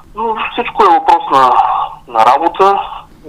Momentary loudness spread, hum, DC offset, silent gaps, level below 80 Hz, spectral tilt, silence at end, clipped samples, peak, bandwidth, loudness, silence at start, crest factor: 9 LU; none; under 0.1%; none; -42 dBFS; -4 dB/octave; 0 s; 0.2%; 0 dBFS; 13.5 kHz; -11 LUFS; 0.15 s; 12 dB